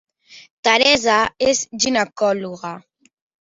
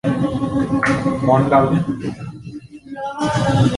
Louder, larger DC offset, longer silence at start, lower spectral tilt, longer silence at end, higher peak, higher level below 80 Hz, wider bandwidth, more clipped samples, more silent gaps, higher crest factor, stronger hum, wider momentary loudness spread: about the same, -17 LUFS vs -18 LUFS; neither; first, 0.3 s vs 0.05 s; second, -2 dB/octave vs -7 dB/octave; first, 0.65 s vs 0 s; about the same, 0 dBFS vs -2 dBFS; second, -54 dBFS vs -42 dBFS; second, 8 kHz vs 11.5 kHz; neither; first, 0.50-0.63 s vs none; about the same, 20 dB vs 16 dB; neither; about the same, 17 LU vs 19 LU